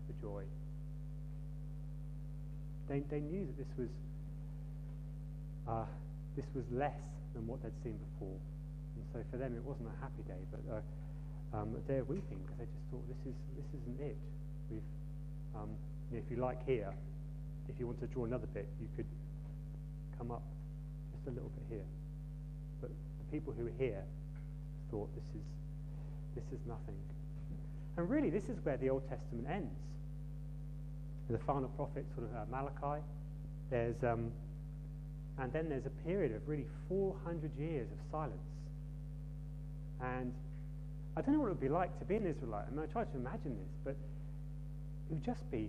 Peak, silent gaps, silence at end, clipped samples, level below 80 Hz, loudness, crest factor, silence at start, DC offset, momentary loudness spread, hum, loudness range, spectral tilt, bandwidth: -22 dBFS; none; 0 s; under 0.1%; -50 dBFS; -44 LUFS; 20 dB; 0 s; under 0.1%; 10 LU; 50 Hz at -45 dBFS; 6 LU; -9 dB/octave; 9.2 kHz